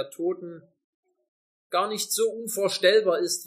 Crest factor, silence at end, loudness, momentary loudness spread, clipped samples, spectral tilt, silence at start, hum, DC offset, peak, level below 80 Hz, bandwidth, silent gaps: 20 dB; 0 s; -25 LUFS; 10 LU; under 0.1%; -2 dB/octave; 0 s; none; under 0.1%; -6 dBFS; -88 dBFS; 15.5 kHz; 0.84-1.03 s, 1.28-1.70 s